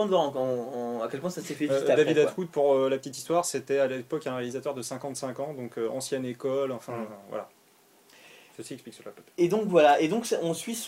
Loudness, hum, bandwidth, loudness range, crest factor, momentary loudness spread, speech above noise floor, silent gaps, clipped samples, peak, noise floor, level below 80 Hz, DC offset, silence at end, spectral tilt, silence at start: -28 LUFS; none; 16 kHz; 8 LU; 20 dB; 17 LU; 33 dB; none; under 0.1%; -8 dBFS; -61 dBFS; -76 dBFS; under 0.1%; 0 s; -4.5 dB/octave; 0 s